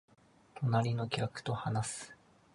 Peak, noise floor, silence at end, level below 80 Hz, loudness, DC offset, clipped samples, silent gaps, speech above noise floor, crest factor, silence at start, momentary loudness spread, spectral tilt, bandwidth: -14 dBFS; -57 dBFS; 0.4 s; -66 dBFS; -35 LUFS; under 0.1%; under 0.1%; none; 23 dB; 22 dB; 0.55 s; 14 LU; -5.5 dB/octave; 11.5 kHz